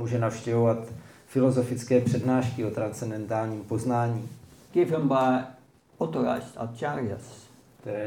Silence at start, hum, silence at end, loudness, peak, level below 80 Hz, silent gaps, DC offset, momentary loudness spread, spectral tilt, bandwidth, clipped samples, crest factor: 0 s; none; 0 s; -27 LUFS; -10 dBFS; -66 dBFS; none; under 0.1%; 13 LU; -7.5 dB/octave; 16 kHz; under 0.1%; 18 dB